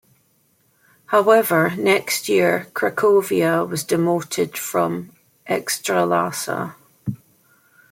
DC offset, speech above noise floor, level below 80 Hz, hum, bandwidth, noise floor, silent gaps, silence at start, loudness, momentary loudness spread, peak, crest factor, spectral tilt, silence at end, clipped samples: under 0.1%; 43 dB; -64 dBFS; none; 16.5 kHz; -62 dBFS; none; 1.1 s; -19 LUFS; 15 LU; -2 dBFS; 18 dB; -4.5 dB/octave; 0.75 s; under 0.1%